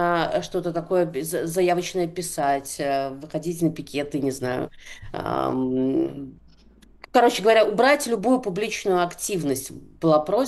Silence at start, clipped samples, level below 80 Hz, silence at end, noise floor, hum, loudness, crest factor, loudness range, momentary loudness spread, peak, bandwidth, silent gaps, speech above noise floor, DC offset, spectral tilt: 0 s; under 0.1%; -52 dBFS; 0 s; -52 dBFS; none; -23 LUFS; 18 dB; 6 LU; 12 LU; -6 dBFS; 12.5 kHz; none; 29 dB; under 0.1%; -4.5 dB/octave